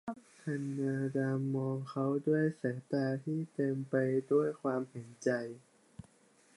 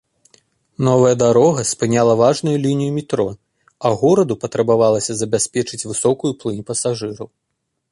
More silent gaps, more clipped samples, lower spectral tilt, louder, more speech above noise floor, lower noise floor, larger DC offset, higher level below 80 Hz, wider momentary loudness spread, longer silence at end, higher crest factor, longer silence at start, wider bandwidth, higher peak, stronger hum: neither; neither; first, -8 dB/octave vs -5.5 dB/octave; second, -35 LUFS vs -17 LUFS; second, 33 dB vs 58 dB; second, -66 dBFS vs -74 dBFS; neither; second, -78 dBFS vs -54 dBFS; about the same, 8 LU vs 9 LU; first, 1 s vs 0.65 s; about the same, 18 dB vs 16 dB; second, 0.05 s vs 0.8 s; about the same, 11.5 kHz vs 11.5 kHz; second, -18 dBFS vs -2 dBFS; neither